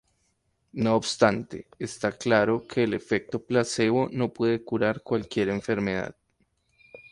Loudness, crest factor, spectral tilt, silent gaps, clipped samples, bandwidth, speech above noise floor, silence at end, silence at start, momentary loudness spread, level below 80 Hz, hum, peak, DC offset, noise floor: -26 LUFS; 20 dB; -5.5 dB/octave; none; under 0.1%; 11.5 kHz; 47 dB; 0.15 s; 0.75 s; 10 LU; -58 dBFS; none; -6 dBFS; under 0.1%; -72 dBFS